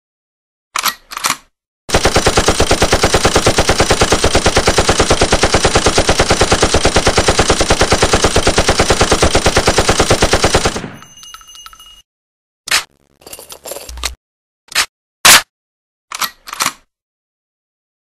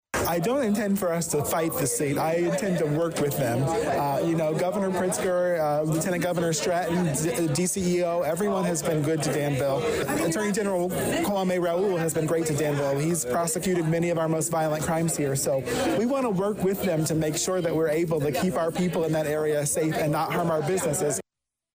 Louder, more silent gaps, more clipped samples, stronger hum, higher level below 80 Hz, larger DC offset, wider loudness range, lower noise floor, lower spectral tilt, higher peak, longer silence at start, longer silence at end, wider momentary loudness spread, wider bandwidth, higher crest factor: first, -12 LUFS vs -25 LUFS; first, 1.67-1.88 s, 12.04-12.64 s, 14.17-14.68 s, 14.89-15.24 s, 15.50-16.08 s vs none; neither; neither; first, -24 dBFS vs -54 dBFS; neither; first, 9 LU vs 0 LU; second, -37 dBFS vs -86 dBFS; second, -3 dB/octave vs -5 dB/octave; first, 0 dBFS vs -16 dBFS; first, 0.75 s vs 0.15 s; first, 1.45 s vs 0.55 s; first, 12 LU vs 1 LU; about the same, 16 kHz vs 16 kHz; first, 14 dB vs 8 dB